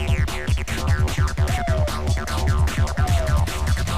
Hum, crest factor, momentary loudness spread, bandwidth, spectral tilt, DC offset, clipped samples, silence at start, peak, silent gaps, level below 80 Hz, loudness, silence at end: none; 12 dB; 3 LU; 15.5 kHz; -5.5 dB/octave; 2%; under 0.1%; 0 s; -8 dBFS; none; -24 dBFS; -22 LUFS; 0 s